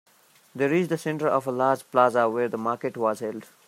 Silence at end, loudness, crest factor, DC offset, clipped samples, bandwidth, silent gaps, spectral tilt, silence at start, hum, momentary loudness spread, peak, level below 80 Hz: 0.25 s; -25 LUFS; 20 dB; under 0.1%; under 0.1%; 16 kHz; none; -6.5 dB/octave; 0.55 s; none; 7 LU; -6 dBFS; -76 dBFS